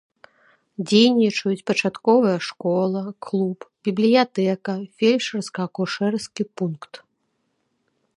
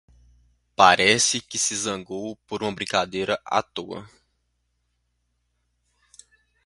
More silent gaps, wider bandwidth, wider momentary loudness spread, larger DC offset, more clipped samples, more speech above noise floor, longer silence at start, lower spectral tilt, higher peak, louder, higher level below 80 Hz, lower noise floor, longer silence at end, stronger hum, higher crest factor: neither; about the same, 11 kHz vs 11.5 kHz; second, 12 LU vs 17 LU; neither; neither; about the same, 51 dB vs 50 dB; about the same, 0.8 s vs 0.8 s; first, -5.5 dB/octave vs -1.5 dB/octave; second, -4 dBFS vs 0 dBFS; about the same, -21 LUFS vs -22 LUFS; second, -72 dBFS vs -60 dBFS; about the same, -72 dBFS vs -73 dBFS; second, 1.2 s vs 2.6 s; second, none vs 60 Hz at -65 dBFS; second, 18 dB vs 26 dB